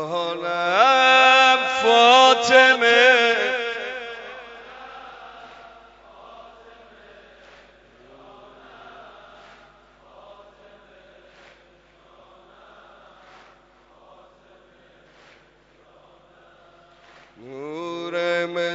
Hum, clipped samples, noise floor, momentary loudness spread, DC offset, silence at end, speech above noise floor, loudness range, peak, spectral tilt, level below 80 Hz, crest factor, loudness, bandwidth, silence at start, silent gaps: 50 Hz at -65 dBFS; under 0.1%; -55 dBFS; 27 LU; under 0.1%; 0 s; 39 dB; 26 LU; 0 dBFS; -1.5 dB/octave; -66 dBFS; 22 dB; -16 LUFS; 8 kHz; 0 s; none